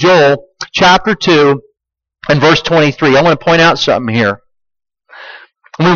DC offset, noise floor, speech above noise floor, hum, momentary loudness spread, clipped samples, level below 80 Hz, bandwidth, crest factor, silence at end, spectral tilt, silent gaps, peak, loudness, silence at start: under 0.1%; -80 dBFS; 70 dB; none; 9 LU; under 0.1%; -42 dBFS; 7.2 kHz; 12 dB; 0 s; -5 dB/octave; none; 0 dBFS; -10 LUFS; 0 s